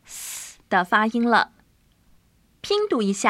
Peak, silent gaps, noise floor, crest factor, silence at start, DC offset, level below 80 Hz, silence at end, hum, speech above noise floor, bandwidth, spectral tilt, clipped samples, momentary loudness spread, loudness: -4 dBFS; none; -60 dBFS; 20 dB; 0.1 s; under 0.1%; -62 dBFS; 0 s; none; 40 dB; 16 kHz; -3.5 dB/octave; under 0.1%; 14 LU; -22 LUFS